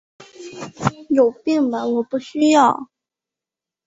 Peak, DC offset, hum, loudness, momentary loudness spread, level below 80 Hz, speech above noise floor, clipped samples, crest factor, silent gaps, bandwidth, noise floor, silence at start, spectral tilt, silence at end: -2 dBFS; under 0.1%; none; -18 LUFS; 20 LU; -58 dBFS; 71 dB; under 0.1%; 18 dB; none; 8 kHz; -88 dBFS; 0.2 s; -5.5 dB/octave; 1 s